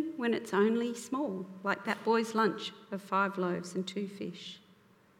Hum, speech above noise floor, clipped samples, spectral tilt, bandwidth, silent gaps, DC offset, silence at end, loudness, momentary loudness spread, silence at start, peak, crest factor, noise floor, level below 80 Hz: none; 30 dB; under 0.1%; -5.5 dB/octave; 15.5 kHz; none; under 0.1%; 0.6 s; -33 LUFS; 13 LU; 0 s; -14 dBFS; 18 dB; -63 dBFS; -84 dBFS